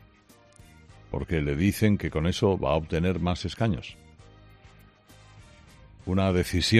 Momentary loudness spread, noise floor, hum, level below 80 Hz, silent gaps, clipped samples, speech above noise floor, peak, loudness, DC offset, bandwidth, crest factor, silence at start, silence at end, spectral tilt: 11 LU; -57 dBFS; none; -46 dBFS; none; under 0.1%; 32 dB; -6 dBFS; -27 LUFS; under 0.1%; 14 kHz; 22 dB; 0.9 s; 0 s; -6 dB/octave